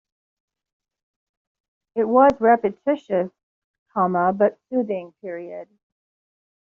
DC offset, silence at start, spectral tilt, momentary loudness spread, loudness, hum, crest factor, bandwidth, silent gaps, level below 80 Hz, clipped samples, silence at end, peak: under 0.1%; 1.95 s; -6.5 dB/octave; 18 LU; -21 LUFS; none; 20 dB; 7.2 kHz; 3.43-3.86 s; -60 dBFS; under 0.1%; 1.1 s; -4 dBFS